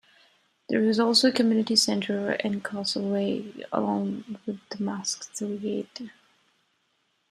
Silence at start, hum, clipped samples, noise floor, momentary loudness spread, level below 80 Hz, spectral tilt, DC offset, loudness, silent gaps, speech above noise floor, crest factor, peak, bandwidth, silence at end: 0.7 s; none; under 0.1%; -72 dBFS; 15 LU; -72 dBFS; -4 dB/octave; under 0.1%; -26 LUFS; none; 46 dB; 20 dB; -8 dBFS; 13 kHz; 1.2 s